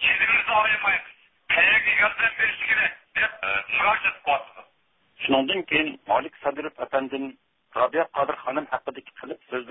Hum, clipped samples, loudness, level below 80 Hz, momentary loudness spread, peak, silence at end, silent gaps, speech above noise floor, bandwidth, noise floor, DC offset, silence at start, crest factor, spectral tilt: none; under 0.1%; -22 LUFS; -58 dBFS; 15 LU; -6 dBFS; 0 s; none; 42 dB; 4 kHz; -66 dBFS; under 0.1%; 0 s; 18 dB; -7.5 dB/octave